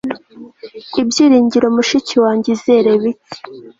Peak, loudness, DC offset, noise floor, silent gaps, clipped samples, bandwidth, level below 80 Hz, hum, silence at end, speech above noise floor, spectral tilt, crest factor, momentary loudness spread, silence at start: -2 dBFS; -13 LUFS; under 0.1%; -37 dBFS; none; under 0.1%; 7.8 kHz; -56 dBFS; none; 0.1 s; 24 dB; -4.5 dB/octave; 12 dB; 21 LU; 0.05 s